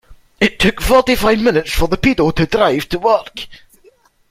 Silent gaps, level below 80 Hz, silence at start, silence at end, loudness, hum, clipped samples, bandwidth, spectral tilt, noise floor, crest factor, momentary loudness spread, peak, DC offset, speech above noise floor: none; -28 dBFS; 0.1 s; 0.75 s; -14 LUFS; none; under 0.1%; 16.5 kHz; -5 dB/octave; -51 dBFS; 16 dB; 6 LU; 0 dBFS; under 0.1%; 37 dB